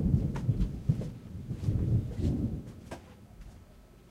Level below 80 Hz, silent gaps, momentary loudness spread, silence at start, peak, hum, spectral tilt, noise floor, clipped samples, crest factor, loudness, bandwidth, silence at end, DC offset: -42 dBFS; none; 22 LU; 0 s; -14 dBFS; none; -9 dB/octave; -55 dBFS; under 0.1%; 20 dB; -33 LUFS; 12 kHz; 0.25 s; under 0.1%